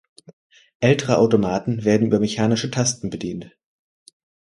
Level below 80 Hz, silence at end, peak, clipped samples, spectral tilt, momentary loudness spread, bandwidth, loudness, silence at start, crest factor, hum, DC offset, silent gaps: -54 dBFS; 1 s; -2 dBFS; under 0.1%; -5.5 dB/octave; 11 LU; 11.5 kHz; -20 LUFS; 0.8 s; 20 dB; none; under 0.1%; none